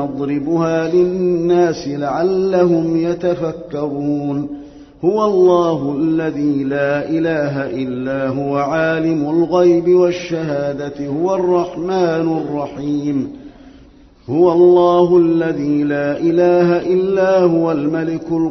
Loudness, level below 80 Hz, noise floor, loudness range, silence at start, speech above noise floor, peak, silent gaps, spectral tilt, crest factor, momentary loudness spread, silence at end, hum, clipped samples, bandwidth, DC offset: -16 LUFS; -50 dBFS; -44 dBFS; 5 LU; 0 s; 29 dB; -2 dBFS; none; -6.5 dB/octave; 14 dB; 10 LU; 0 s; none; under 0.1%; 6.4 kHz; under 0.1%